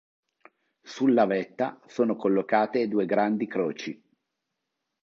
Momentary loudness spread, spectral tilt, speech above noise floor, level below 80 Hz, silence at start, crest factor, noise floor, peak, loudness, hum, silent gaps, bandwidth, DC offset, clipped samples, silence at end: 12 LU; -6.5 dB/octave; 57 dB; -76 dBFS; 0.85 s; 20 dB; -83 dBFS; -8 dBFS; -26 LUFS; none; none; 7.4 kHz; under 0.1%; under 0.1%; 1.1 s